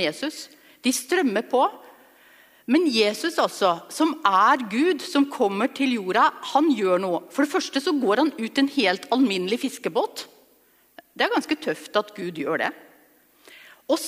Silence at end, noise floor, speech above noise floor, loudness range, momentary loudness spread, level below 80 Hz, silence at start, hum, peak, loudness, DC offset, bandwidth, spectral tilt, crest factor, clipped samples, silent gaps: 0 s; -60 dBFS; 37 dB; 6 LU; 8 LU; -76 dBFS; 0 s; none; -4 dBFS; -23 LUFS; under 0.1%; 15.5 kHz; -3.5 dB/octave; 20 dB; under 0.1%; none